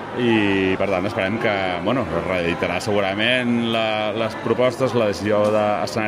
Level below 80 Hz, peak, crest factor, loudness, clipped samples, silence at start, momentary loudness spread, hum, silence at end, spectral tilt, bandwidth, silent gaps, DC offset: -52 dBFS; -4 dBFS; 16 dB; -20 LUFS; under 0.1%; 0 s; 4 LU; none; 0 s; -5.5 dB/octave; 15.5 kHz; none; under 0.1%